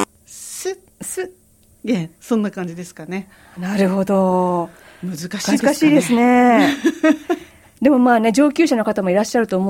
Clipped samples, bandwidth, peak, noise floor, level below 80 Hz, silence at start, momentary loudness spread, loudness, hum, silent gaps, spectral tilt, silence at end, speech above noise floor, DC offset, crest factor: under 0.1%; 16.5 kHz; -2 dBFS; -53 dBFS; -58 dBFS; 0 s; 16 LU; -17 LUFS; none; none; -5.5 dB/octave; 0 s; 36 dB; under 0.1%; 16 dB